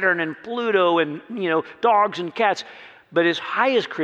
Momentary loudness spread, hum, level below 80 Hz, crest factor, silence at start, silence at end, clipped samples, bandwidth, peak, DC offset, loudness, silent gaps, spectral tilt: 8 LU; none; -76 dBFS; 16 dB; 0 s; 0 s; under 0.1%; 8.4 kHz; -6 dBFS; under 0.1%; -21 LUFS; none; -5 dB/octave